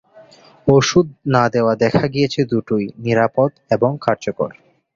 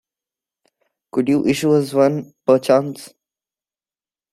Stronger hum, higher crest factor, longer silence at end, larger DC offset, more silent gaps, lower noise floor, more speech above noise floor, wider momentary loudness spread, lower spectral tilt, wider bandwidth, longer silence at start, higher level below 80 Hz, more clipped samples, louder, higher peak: neither; about the same, 16 dB vs 18 dB; second, 0.45 s vs 1.25 s; neither; neither; second, -46 dBFS vs under -90 dBFS; second, 29 dB vs over 73 dB; second, 7 LU vs 10 LU; about the same, -6 dB/octave vs -6.5 dB/octave; second, 7.6 kHz vs 14 kHz; second, 0.15 s vs 1.15 s; first, -50 dBFS vs -60 dBFS; neither; about the same, -17 LUFS vs -17 LUFS; about the same, -2 dBFS vs -2 dBFS